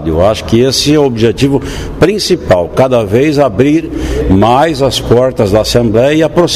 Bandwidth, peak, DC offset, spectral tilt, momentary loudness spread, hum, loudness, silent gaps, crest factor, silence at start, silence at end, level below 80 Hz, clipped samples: 15.5 kHz; 0 dBFS; 0.4%; -5.5 dB/octave; 4 LU; none; -10 LUFS; none; 10 dB; 0 s; 0 s; -26 dBFS; 0.3%